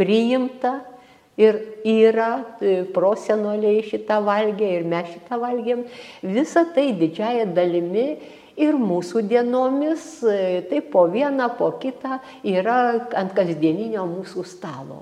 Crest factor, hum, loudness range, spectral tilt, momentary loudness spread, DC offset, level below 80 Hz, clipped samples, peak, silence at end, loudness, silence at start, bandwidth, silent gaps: 18 dB; none; 2 LU; -6.5 dB/octave; 11 LU; under 0.1%; -72 dBFS; under 0.1%; -2 dBFS; 0 s; -21 LUFS; 0 s; 10.5 kHz; none